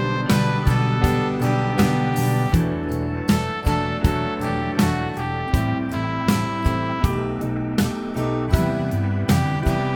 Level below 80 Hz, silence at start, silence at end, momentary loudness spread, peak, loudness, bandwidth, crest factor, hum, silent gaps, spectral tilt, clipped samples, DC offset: -32 dBFS; 0 s; 0 s; 5 LU; -2 dBFS; -22 LUFS; 19 kHz; 18 dB; none; none; -6.5 dB/octave; under 0.1%; under 0.1%